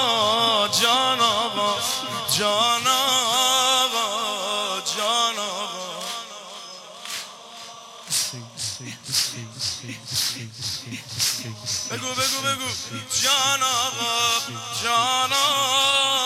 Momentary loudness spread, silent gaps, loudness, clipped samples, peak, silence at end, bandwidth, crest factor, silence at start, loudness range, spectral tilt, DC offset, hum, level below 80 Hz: 14 LU; none; -21 LUFS; under 0.1%; -8 dBFS; 0 s; 16.5 kHz; 16 dB; 0 s; 8 LU; -0.5 dB/octave; under 0.1%; none; -64 dBFS